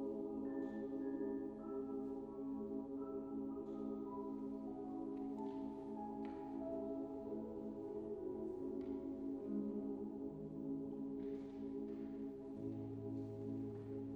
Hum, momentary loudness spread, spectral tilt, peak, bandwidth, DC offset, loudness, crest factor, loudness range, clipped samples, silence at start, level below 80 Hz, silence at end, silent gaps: none; 3 LU; -10 dB/octave; -32 dBFS; 4.7 kHz; under 0.1%; -47 LUFS; 14 dB; 1 LU; under 0.1%; 0 s; -70 dBFS; 0 s; none